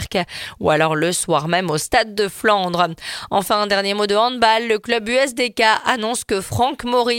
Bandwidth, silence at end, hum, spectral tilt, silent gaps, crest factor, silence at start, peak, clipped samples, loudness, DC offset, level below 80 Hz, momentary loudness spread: 17 kHz; 0 s; none; -3.5 dB/octave; none; 18 dB; 0 s; 0 dBFS; under 0.1%; -18 LUFS; under 0.1%; -48 dBFS; 6 LU